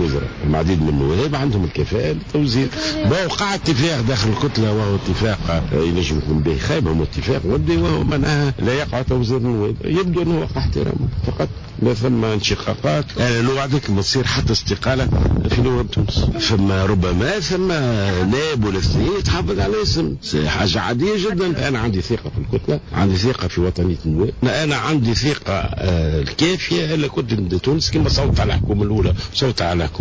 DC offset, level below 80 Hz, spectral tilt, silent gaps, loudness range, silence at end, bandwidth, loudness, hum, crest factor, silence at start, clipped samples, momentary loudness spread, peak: under 0.1%; -28 dBFS; -6 dB/octave; none; 2 LU; 0 s; 8 kHz; -19 LUFS; none; 14 dB; 0 s; under 0.1%; 3 LU; -4 dBFS